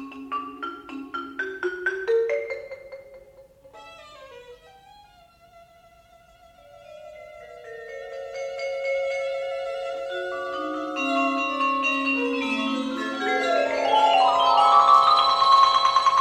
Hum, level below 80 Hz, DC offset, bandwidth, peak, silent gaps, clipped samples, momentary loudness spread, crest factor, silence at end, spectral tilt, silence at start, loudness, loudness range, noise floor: none; -64 dBFS; under 0.1%; 11.5 kHz; -6 dBFS; none; under 0.1%; 22 LU; 18 dB; 0 s; -2.5 dB/octave; 0 s; -22 LUFS; 19 LU; -54 dBFS